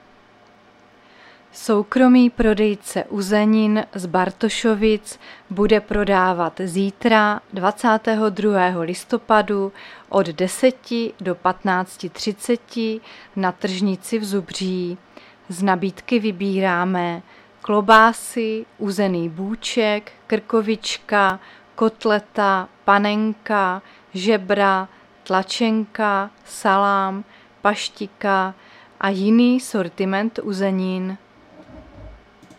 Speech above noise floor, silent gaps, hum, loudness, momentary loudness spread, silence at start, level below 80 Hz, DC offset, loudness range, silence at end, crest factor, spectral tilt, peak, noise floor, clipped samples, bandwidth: 32 dB; none; none; -20 LUFS; 10 LU; 1.55 s; -48 dBFS; under 0.1%; 5 LU; 0.4 s; 20 dB; -5 dB/octave; 0 dBFS; -51 dBFS; under 0.1%; 14.5 kHz